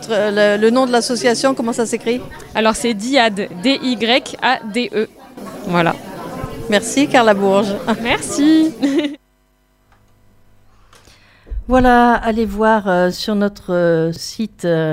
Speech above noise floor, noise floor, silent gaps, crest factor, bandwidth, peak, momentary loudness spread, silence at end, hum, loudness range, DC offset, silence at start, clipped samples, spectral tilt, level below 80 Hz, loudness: 43 dB; -58 dBFS; none; 16 dB; 16 kHz; 0 dBFS; 12 LU; 0 s; 50 Hz at -45 dBFS; 4 LU; under 0.1%; 0 s; under 0.1%; -4.5 dB/octave; -36 dBFS; -16 LUFS